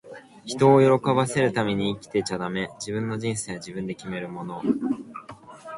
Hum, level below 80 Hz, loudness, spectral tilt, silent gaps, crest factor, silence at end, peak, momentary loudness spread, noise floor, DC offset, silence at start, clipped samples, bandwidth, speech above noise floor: none; -60 dBFS; -24 LUFS; -5.5 dB/octave; none; 20 dB; 0 s; -6 dBFS; 21 LU; -44 dBFS; under 0.1%; 0.05 s; under 0.1%; 11.5 kHz; 20 dB